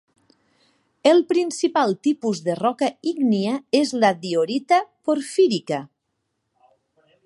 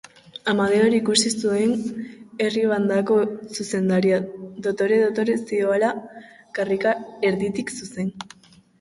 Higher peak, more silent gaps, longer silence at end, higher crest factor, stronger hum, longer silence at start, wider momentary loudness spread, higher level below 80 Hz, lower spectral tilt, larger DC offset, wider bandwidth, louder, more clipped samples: first, -2 dBFS vs -6 dBFS; neither; first, 1.4 s vs 0.55 s; about the same, 20 dB vs 18 dB; neither; first, 1.05 s vs 0.45 s; second, 7 LU vs 14 LU; second, -74 dBFS vs -62 dBFS; about the same, -5 dB/octave vs -4.5 dB/octave; neither; about the same, 11.5 kHz vs 11.5 kHz; about the same, -21 LUFS vs -22 LUFS; neither